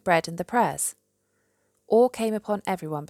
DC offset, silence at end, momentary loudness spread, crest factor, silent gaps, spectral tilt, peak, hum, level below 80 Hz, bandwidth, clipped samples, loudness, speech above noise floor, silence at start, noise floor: under 0.1%; 0.05 s; 8 LU; 18 dB; none; -4.5 dB/octave; -8 dBFS; none; -66 dBFS; 16 kHz; under 0.1%; -25 LUFS; 47 dB; 0.05 s; -72 dBFS